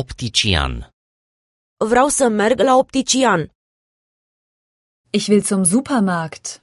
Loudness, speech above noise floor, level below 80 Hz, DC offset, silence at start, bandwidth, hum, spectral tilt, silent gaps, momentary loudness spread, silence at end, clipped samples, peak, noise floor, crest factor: -16 LUFS; over 73 dB; -36 dBFS; under 0.1%; 0 s; 11.5 kHz; none; -4 dB/octave; 0.93-1.77 s, 3.55-5.04 s; 10 LU; 0.05 s; under 0.1%; -2 dBFS; under -90 dBFS; 18 dB